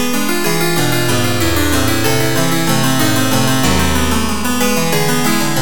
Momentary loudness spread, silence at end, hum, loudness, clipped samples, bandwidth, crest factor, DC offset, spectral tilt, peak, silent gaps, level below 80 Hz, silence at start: 2 LU; 0 s; none; -14 LUFS; under 0.1%; 19.5 kHz; 14 dB; 10%; -4 dB/octave; 0 dBFS; none; -30 dBFS; 0 s